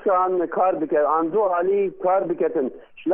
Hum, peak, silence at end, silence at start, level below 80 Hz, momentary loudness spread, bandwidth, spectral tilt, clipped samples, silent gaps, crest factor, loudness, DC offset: none; -8 dBFS; 0 s; 0 s; -64 dBFS; 4 LU; 3.5 kHz; -11 dB/octave; under 0.1%; none; 12 dB; -21 LUFS; under 0.1%